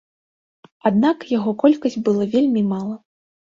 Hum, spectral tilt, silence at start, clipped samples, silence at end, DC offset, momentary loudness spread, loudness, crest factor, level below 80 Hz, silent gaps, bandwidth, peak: none; -7.5 dB/octave; 0.85 s; under 0.1%; 0.55 s; under 0.1%; 8 LU; -19 LUFS; 18 dB; -62 dBFS; none; 7.4 kHz; -2 dBFS